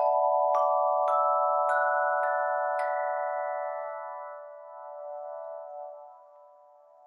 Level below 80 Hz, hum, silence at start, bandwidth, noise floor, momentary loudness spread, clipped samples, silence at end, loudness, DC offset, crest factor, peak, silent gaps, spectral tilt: under -90 dBFS; none; 0 s; 11 kHz; -56 dBFS; 18 LU; under 0.1%; 0.85 s; -27 LUFS; under 0.1%; 14 dB; -14 dBFS; none; -0.5 dB/octave